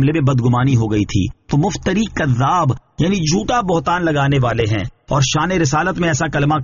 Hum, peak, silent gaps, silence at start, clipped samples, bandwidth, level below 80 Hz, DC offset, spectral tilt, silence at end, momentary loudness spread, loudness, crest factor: none; -4 dBFS; none; 0 s; under 0.1%; 7.4 kHz; -36 dBFS; under 0.1%; -5.5 dB/octave; 0 s; 4 LU; -17 LUFS; 12 dB